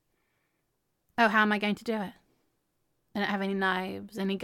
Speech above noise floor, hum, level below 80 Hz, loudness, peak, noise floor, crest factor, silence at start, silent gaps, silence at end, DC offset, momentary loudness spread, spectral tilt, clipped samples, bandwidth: 49 dB; none; -74 dBFS; -29 LUFS; -10 dBFS; -78 dBFS; 22 dB; 1.2 s; none; 0 s; under 0.1%; 14 LU; -5.5 dB/octave; under 0.1%; 15 kHz